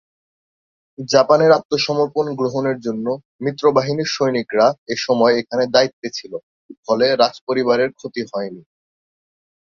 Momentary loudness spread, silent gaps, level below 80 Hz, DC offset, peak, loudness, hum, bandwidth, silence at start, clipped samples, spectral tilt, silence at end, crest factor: 13 LU; 1.65-1.69 s, 3.25-3.39 s, 4.78-4.86 s, 5.93-6.02 s, 6.43-6.69 s, 6.77-6.83 s, 7.41-7.47 s; -62 dBFS; under 0.1%; 0 dBFS; -18 LUFS; none; 7.4 kHz; 1 s; under 0.1%; -5 dB/octave; 1.1 s; 18 dB